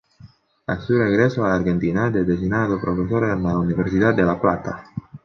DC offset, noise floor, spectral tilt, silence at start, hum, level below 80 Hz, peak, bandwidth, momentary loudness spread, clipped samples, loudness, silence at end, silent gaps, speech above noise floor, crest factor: under 0.1%; -48 dBFS; -8.5 dB/octave; 0.25 s; none; -42 dBFS; -4 dBFS; 6.4 kHz; 10 LU; under 0.1%; -20 LUFS; 0.05 s; none; 29 dB; 18 dB